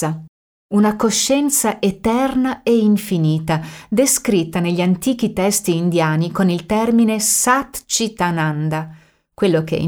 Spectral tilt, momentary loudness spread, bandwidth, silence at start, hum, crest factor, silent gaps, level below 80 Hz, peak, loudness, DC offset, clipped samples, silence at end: -4.5 dB/octave; 7 LU; over 20 kHz; 0 s; none; 14 dB; 0.29-0.69 s; -48 dBFS; -2 dBFS; -17 LUFS; under 0.1%; under 0.1%; 0 s